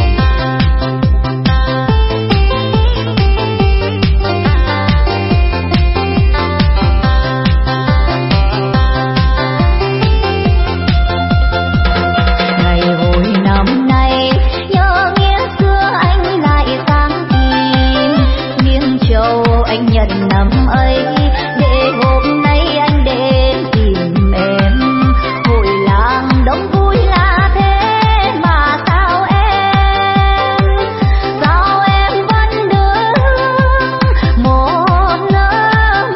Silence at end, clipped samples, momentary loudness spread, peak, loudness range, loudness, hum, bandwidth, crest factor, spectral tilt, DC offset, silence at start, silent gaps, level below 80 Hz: 0 s; under 0.1%; 3 LU; 0 dBFS; 2 LU; -12 LUFS; none; 5.8 kHz; 10 dB; -10 dB/octave; under 0.1%; 0 s; none; -14 dBFS